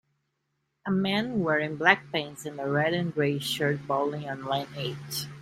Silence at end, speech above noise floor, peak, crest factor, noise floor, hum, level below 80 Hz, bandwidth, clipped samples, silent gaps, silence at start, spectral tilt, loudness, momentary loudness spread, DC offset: 0 s; 50 dB; -4 dBFS; 24 dB; -78 dBFS; none; -66 dBFS; 16 kHz; under 0.1%; none; 0.85 s; -5 dB/octave; -28 LUFS; 12 LU; under 0.1%